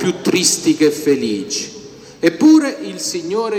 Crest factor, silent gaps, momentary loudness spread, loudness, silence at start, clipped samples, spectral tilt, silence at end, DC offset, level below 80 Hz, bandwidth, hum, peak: 16 dB; none; 12 LU; -15 LUFS; 0 s; under 0.1%; -3.5 dB/octave; 0 s; under 0.1%; -62 dBFS; 17.5 kHz; none; 0 dBFS